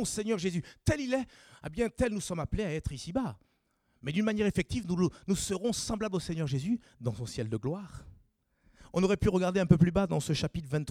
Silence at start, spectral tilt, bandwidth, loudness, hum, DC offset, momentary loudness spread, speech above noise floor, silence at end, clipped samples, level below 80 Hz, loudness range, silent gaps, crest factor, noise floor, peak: 0 s; -6 dB/octave; 15.5 kHz; -31 LUFS; none; under 0.1%; 10 LU; 44 dB; 0 s; under 0.1%; -48 dBFS; 5 LU; none; 24 dB; -74 dBFS; -8 dBFS